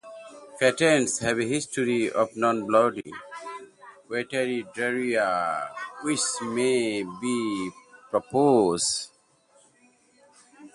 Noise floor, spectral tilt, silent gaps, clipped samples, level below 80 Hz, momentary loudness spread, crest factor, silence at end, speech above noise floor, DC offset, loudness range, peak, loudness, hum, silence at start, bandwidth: -61 dBFS; -3.5 dB/octave; none; under 0.1%; -66 dBFS; 18 LU; 20 dB; 0.05 s; 37 dB; under 0.1%; 4 LU; -6 dBFS; -25 LUFS; none; 0.05 s; 11.5 kHz